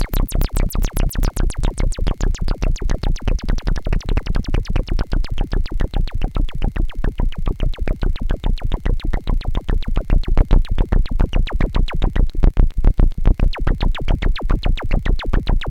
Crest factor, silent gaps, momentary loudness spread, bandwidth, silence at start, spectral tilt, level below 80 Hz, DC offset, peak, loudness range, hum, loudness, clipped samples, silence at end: 12 dB; none; 5 LU; 16.5 kHz; 0 s; -6 dB/octave; -16 dBFS; under 0.1%; -2 dBFS; 4 LU; none; -23 LUFS; under 0.1%; 0 s